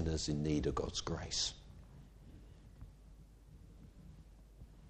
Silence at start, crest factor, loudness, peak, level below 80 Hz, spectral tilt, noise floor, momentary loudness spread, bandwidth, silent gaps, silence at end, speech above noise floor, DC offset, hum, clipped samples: 0 s; 20 dB; -38 LUFS; -24 dBFS; -52 dBFS; -4.5 dB/octave; -58 dBFS; 25 LU; 10 kHz; none; 0 s; 21 dB; under 0.1%; none; under 0.1%